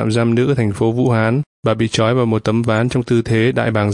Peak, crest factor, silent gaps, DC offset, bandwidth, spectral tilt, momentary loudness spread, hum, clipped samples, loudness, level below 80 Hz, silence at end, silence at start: -2 dBFS; 14 dB; 1.46-1.63 s; under 0.1%; 11 kHz; -7 dB/octave; 3 LU; none; under 0.1%; -16 LUFS; -46 dBFS; 0 s; 0 s